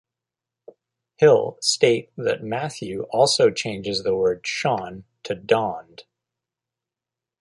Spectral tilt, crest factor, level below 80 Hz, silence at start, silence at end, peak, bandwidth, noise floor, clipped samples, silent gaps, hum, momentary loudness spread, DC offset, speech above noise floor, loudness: -3.5 dB/octave; 20 dB; -60 dBFS; 1.2 s; 1.4 s; -2 dBFS; 11.5 kHz; -88 dBFS; under 0.1%; none; none; 14 LU; under 0.1%; 67 dB; -21 LUFS